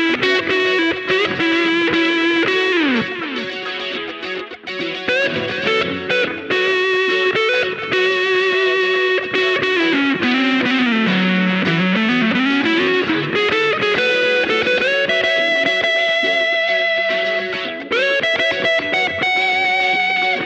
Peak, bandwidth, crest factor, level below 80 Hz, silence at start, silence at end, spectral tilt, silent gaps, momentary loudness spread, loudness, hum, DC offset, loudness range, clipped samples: -2 dBFS; 8.8 kHz; 14 dB; -58 dBFS; 0 s; 0 s; -4.5 dB/octave; none; 5 LU; -16 LUFS; none; under 0.1%; 4 LU; under 0.1%